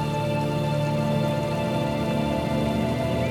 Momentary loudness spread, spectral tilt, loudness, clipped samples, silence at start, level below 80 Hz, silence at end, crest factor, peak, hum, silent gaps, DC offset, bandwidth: 1 LU; -7 dB/octave; -25 LUFS; under 0.1%; 0 s; -42 dBFS; 0 s; 12 dB; -12 dBFS; none; none; under 0.1%; 16.5 kHz